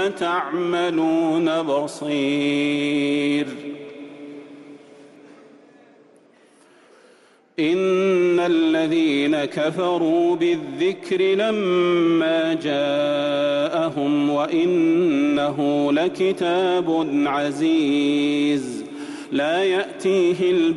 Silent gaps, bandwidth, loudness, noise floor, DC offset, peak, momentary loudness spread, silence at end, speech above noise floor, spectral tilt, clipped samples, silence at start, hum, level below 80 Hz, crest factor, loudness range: none; 11.5 kHz; -20 LUFS; -54 dBFS; under 0.1%; -10 dBFS; 7 LU; 0 s; 34 dB; -5.5 dB/octave; under 0.1%; 0 s; none; -68 dBFS; 12 dB; 6 LU